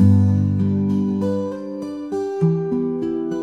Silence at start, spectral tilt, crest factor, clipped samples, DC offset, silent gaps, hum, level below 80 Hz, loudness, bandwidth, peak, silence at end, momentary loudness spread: 0 s; -10 dB/octave; 16 dB; under 0.1%; under 0.1%; none; none; -54 dBFS; -21 LUFS; 7.2 kHz; -4 dBFS; 0 s; 10 LU